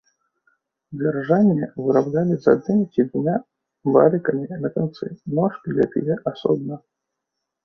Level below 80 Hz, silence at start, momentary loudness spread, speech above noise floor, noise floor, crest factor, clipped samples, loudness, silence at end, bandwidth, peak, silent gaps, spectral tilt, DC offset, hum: -62 dBFS; 0.9 s; 10 LU; 61 dB; -81 dBFS; 20 dB; under 0.1%; -21 LUFS; 0.85 s; 6.2 kHz; -2 dBFS; none; -10 dB/octave; under 0.1%; none